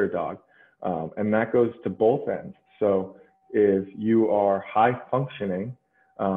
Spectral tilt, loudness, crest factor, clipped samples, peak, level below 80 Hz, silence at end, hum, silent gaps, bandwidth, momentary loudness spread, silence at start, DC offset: -10 dB/octave; -25 LUFS; 16 dB; under 0.1%; -8 dBFS; -66 dBFS; 0 s; none; none; 3.9 kHz; 12 LU; 0 s; under 0.1%